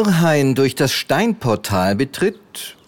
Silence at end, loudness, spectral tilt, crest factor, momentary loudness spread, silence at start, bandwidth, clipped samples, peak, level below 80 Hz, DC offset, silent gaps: 0.15 s; -17 LUFS; -5.5 dB/octave; 14 dB; 7 LU; 0 s; 18 kHz; under 0.1%; -4 dBFS; -52 dBFS; under 0.1%; none